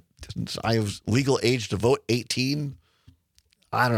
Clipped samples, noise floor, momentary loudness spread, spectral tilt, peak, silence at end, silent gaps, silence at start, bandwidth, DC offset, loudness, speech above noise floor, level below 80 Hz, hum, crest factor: under 0.1%; -65 dBFS; 10 LU; -5 dB/octave; -6 dBFS; 0 s; none; 0.2 s; 15.5 kHz; under 0.1%; -25 LUFS; 40 dB; -56 dBFS; none; 20 dB